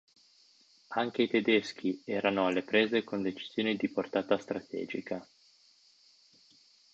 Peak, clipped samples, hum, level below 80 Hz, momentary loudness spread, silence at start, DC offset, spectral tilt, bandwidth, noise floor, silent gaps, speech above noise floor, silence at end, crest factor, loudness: -12 dBFS; under 0.1%; none; -74 dBFS; 10 LU; 0.9 s; under 0.1%; -5.5 dB/octave; 8 kHz; -64 dBFS; none; 33 dB; 1.7 s; 22 dB; -31 LUFS